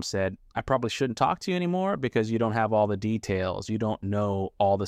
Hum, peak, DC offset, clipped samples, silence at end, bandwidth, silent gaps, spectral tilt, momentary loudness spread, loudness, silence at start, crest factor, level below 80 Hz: none; -10 dBFS; under 0.1%; under 0.1%; 0 s; 13.5 kHz; none; -6 dB/octave; 5 LU; -27 LUFS; 0 s; 18 dB; -54 dBFS